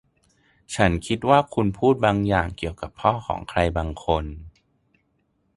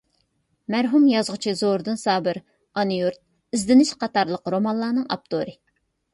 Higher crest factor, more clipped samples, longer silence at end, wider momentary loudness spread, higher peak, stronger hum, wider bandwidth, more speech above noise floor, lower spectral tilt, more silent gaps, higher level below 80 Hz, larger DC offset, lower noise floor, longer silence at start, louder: first, 22 dB vs 16 dB; neither; first, 1.05 s vs 0.6 s; about the same, 12 LU vs 11 LU; first, -2 dBFS vs -6 dBFS; neither; about the same, 11.5 kHz vs 11.5 kHz; about the same, 47 dB vs 48 dB; about the same, -6 dB/octave vs -5 dB/octave; neither; first, -38 dBFS vs -62 dBFS; neither; about the same, -69 dBFS vs -69 dBFS; about the same, 0.7 s vs 0.7 s; about the same, -23 LUFS vs -22 LUFS